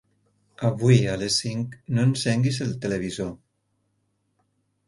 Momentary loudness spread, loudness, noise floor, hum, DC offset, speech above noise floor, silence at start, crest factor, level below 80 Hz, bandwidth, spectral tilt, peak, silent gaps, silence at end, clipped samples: 11 LU; -24 LUFS; -72 dBFS; none; under 0.1%; 49 dB; 0.6 s; 20 dB; -54 dBFS; 11.5 kHz; -5.5 dB/octave; -4 dBFS; none; 1.5 s; under 0.1%